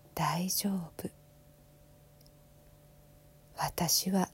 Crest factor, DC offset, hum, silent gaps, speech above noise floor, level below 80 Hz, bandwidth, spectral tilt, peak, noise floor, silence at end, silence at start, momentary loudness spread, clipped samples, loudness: 20 dB; under 0.1%; none; none; 27 dB; -62 dBFS; 16.5 kHz; -3.5 dB/octave; -16 dBFS; -59 dBFS; 0.05 s; 0.15 s; 17 LU; under 0.1%; -32 LUFS